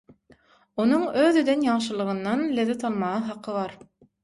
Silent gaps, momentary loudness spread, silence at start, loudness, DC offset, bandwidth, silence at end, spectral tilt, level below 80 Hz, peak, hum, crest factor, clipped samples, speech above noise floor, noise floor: none; 10 LU; 0.75 s; -24 LUFS; under 0.1%; 11.5 kHz; 0.5 s; -5.5 dB/octave; -66 dBFS; -8 dBFS; none; 16 dB; under 0.1%; 34 dB; -58 dBFS